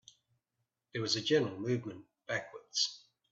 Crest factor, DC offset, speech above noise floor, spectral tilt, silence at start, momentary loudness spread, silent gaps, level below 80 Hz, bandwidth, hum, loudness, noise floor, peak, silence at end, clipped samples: 20 dB; under 0.1%; 52 dB; -3.5 dB/octave; 0.95 s; 16 LU; none; -78 dBFS; 8.2 kHz; none; -34 LUFS; -86 dBFS; -16 dBFS; 0.35 s; under 0.1%